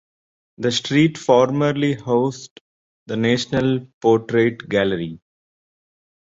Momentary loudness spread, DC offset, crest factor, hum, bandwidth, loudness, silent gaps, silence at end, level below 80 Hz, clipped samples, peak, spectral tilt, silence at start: 9 LU; under 0.1%; 18 dB; none; 7.8 kHz; -19 LUFS; 2.51-3.06 s, 3.93-4.01 s; 1.05 s; -56 dBFS; under 0.1%; -2 dBFS; -6 dB/octave; 0.6 s